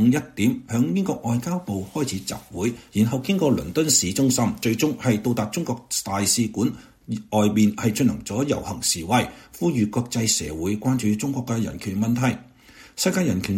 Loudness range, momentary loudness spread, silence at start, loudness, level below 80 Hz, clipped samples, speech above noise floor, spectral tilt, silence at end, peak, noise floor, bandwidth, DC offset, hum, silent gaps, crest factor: 3 LU; 7 LU; 0 s; -23 LUFS; -50 dBFS; under 0.1%; 26 dB; -4.5 dB/octave; 0 s; -6 dBFS; -49 dBFS; 16.5 kHz; under 0.1%; none; none; 18 dB